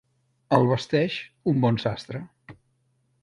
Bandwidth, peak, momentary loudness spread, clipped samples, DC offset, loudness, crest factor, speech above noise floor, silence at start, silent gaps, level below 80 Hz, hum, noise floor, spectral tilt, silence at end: 10.5 kHz; -6 dBFS; 16 LU; under 0.1%; under 0.1%; -24 LUFS; 20 dB; 46 dB; 0.5 s; none; -60 dBFS; none; -69 dBFS; -7.5 dB/octave; 0.7 s